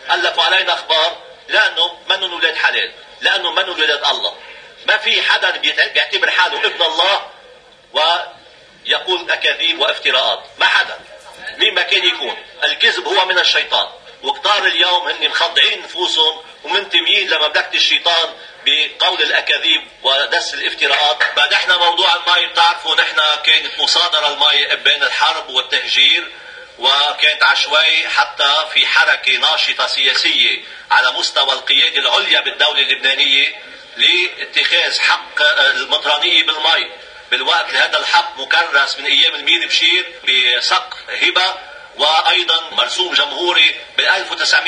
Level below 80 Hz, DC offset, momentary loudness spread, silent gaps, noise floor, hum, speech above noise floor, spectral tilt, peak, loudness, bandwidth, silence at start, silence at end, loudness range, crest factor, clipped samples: -64 dBFS; under 0.1%; 7 LU; none; -43 dBFS; none; 29 dB; 1 dB/octave; 0 dBFS; -13 LUFS; 10.5 kHz; 0 s; 0 s; 3 LU; 16 dB; under 0.1%